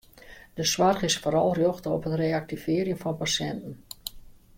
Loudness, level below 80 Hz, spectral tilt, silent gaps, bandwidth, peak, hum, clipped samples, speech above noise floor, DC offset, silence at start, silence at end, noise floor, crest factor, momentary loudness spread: -26 LUFS; -54 dBFS; -4 dB/octave; none; 16.5 kHz; -10 dBFS; none; under 0.1%; 23 dB; under 0.1%; 0.2 s; 0.25 s; -49 dBFS; 18 dB; 16 LU